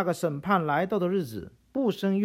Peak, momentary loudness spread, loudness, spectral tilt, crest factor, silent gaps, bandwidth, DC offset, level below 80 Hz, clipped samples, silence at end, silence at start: -10 dBFS; 11 LU; -28 LUFS; -7 dB/octave; 16 dB; none; 16 kHz; under 0.1%; -62 dBFS; under 0.1%; 0 s; 0 s